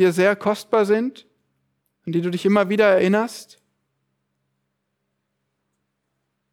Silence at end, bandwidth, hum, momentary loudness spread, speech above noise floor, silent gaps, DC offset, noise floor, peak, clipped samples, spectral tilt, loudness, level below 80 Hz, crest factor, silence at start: 3.1 s; 16 kHz; none; 13 LU; 57 dB; none; under 0.1%; -76 dBFS; -4 dBFS; under 0.1%; -6 dB/octave; -20 LUFS; -72 dBFS; 18 dB; 0 s